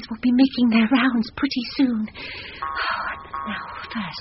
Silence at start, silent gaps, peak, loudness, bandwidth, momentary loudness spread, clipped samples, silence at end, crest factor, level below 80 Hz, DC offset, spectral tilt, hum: 0 s; none; -6 dBFS; -22 LUFS; 6 kHz; 13 LU; under 0.1%; 0 s; 16 dB; -52 dBFS; under 0.1%; -3 dB/octave; none